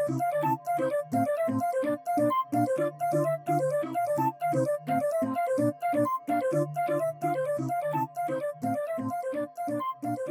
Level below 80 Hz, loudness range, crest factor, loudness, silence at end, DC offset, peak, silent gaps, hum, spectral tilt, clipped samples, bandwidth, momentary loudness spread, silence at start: -78 dBFS; 3 LU; 12 dB; -29 LUFS; 0 s; under 0.1%; -16 dBFS; none; none; -7 dB/octave; under 0.1%; 19.5 kHz; 5 LU; 0 s